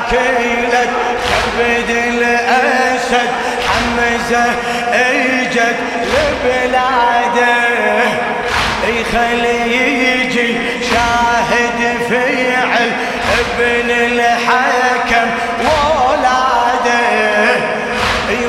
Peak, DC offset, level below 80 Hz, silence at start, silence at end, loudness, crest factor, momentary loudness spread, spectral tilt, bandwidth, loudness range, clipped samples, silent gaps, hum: 0 dBFS; under 0.1%; -36 dBFS; 0 s; 0 s; -13 LUFS; 12 dB; 4 LU; -3.5 dB/octave; 15.5 kHz; 1 LU; under 0.1%; none; none